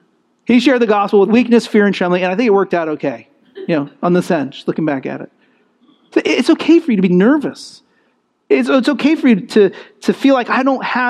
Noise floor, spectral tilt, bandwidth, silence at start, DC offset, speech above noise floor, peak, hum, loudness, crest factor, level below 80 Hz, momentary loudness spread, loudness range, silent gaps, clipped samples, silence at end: -61 dBFS; -6.5 dB/octave; 12 kHz; 0.5 s; under 0.1%; 48 dB; 0 dBFS; none; -14 LUFS; 14 dB; -66 dBFS; 11 LU; 5 LU; none; under 0.1%; 0 s